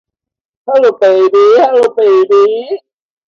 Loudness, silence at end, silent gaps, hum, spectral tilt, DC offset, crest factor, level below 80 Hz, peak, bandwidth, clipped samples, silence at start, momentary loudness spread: -9 LUFS; 0.5 s; none; none; -4.5 dB/octave; under 0.1%; 10 dB; -62 dBFS; 0 dBFS; 7.2 kHz; under 0.1%; 0.65 s; 14 LU